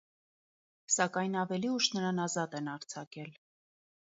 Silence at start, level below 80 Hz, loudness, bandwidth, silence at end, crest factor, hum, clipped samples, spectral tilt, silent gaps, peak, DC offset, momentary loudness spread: 0.9 s; -84 dBFS; -33 LUFS; 7.6 kHz; 0.75 s; 22 dB; none; under 0.1%; -3.5 dB/octave; 3.07-3.11 s; -14 dBFS; under 0.1%; 15 LU